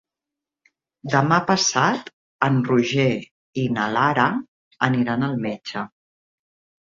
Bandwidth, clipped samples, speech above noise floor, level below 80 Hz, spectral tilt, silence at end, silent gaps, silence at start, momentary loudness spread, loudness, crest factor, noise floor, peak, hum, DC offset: 7.6 kHz; under 0.1%; 67 dB; -62 dBFS; -4.5 dB/octave; 0.95 s; 2.13-2.39 s, 3.31-3.53 s, 4.48-4.71 s; 1.05 s; 12 LU; -21 LUFS; 20 dB; -87 dBFS; -2 dBFS; none; under 0.1%